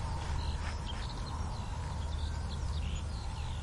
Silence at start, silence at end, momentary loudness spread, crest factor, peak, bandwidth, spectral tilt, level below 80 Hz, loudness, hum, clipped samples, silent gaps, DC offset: 0 s; 0 s; 3 LU; 12 dB; -24 dBFS; 11.5 kHz; -5 dB/octave; -40 dBFS; -39 LUFS; none; under 0.1%; none; under 0.1%